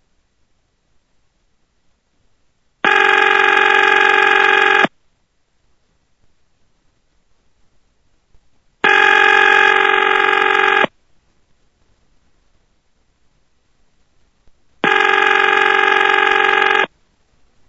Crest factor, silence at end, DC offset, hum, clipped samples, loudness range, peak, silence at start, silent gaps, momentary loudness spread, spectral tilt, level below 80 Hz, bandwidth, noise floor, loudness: 16 dB; 0.8 s; under 0.1%; none; under 0.1%; 9 LU; 0 dBFS; 2.85 s; none; 6 LU; -2 dB/octave; -58 dBFS; 11 kHz; -63 dBFS; -12 LUFS